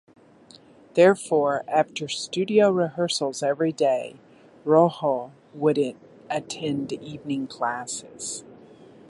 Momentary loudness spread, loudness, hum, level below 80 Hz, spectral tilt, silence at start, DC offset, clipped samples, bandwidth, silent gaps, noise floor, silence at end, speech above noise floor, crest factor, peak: 14 LU; -24 LUFS; none; -70 dBFS; -4.5 dB/octave; 0.95 s; under 0.1%; under 0.1%; 11.5 kHz; none; -52 dBFS; 0.55 s; 28 dB; 20 dB; -4 dBFS